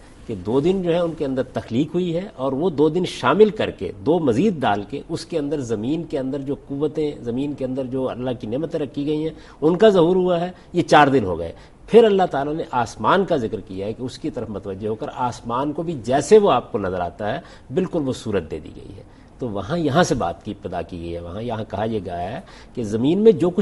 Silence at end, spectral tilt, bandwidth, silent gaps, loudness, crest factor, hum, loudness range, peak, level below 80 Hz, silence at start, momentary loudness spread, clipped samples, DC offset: 0 s; -6.5 dB/octave; 11.5 kHz; none; -21 LUFS; 20 dB; none; 7 LU; 0 dBFS; -48 dBFS; 0 s; 15 LU; under 0.1%; under 0.1%